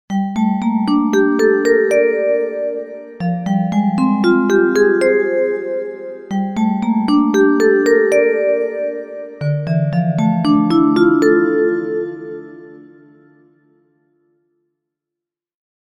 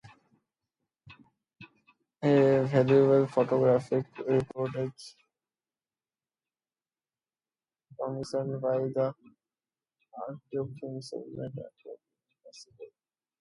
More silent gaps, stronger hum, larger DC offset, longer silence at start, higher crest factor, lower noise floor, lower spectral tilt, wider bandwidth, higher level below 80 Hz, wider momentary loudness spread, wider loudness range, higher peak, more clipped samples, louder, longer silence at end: neither; neither; neither; about the same, 0.1 s vs 0.05 s; second, 14 dB vs 20 dB; second, -85 dBFS vs under -90 dBFS; about the same, -7 dB/octave vs -8 dB/octave; first, 14.5 kHz vs 11 kHz; first, -54 dBFS vs -70 dBFS; second, 11 LU vs 21 LU; second, 3 LU vs 16 LU; first, -2 dBFS vs -10 dBFS; neither; first, -15 LUFS vs -28 LUFS; first, 3.05 s vs 0.55 s